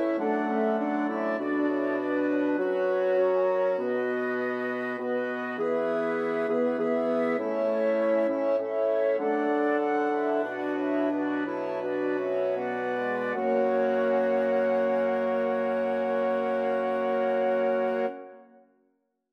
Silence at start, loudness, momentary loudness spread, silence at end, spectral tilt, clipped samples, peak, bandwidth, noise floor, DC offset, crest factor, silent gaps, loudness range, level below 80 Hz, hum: 0 s; -27 LUFS; 5 LU; 0.9 s; -7 dB/octave; under 0.1%; -14 dBFS; 6.2 kHz; -73 dBFS; under 0.1%; 12 dB; none; 2 LU; -84 dBFS; none